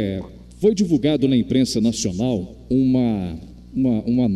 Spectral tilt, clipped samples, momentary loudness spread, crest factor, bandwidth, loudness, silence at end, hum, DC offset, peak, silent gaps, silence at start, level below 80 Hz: -6.5 dB/octave; under 0.1%; 13 LU; 14 dB; 12 kHz; -20 LUFS; 0 s; none; under 0.1%; -6 dBFS; none; 0 s; -44 dBFS